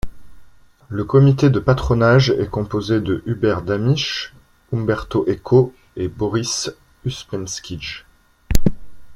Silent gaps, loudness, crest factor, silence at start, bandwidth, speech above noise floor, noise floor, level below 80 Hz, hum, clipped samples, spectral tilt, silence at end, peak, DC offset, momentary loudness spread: none; -19 LUFS; 18 dB; 0.05 s; 15.5 kHz; 28 dB; -46 dBFS; -34 dBFS; none; under 0.1%; -6 dB/octave; 0 s; 0 dBFS; under 0.1%; 15 LU